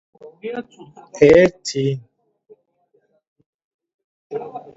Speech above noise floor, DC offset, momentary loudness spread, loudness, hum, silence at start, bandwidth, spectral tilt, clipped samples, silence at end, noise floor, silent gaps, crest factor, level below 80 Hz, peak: 46 dB; under 0.1%; 22 LU; -17 LUFS; none; 0.25 s; 8 kHz; -6 dB/octave; under 0.1%; 0.15 s; -64 dBFS; 3.27-3.36 s, 3.46-3.79 s, 3.94-4.30 s; 20 dB; -52 dBFS; 0 dBFS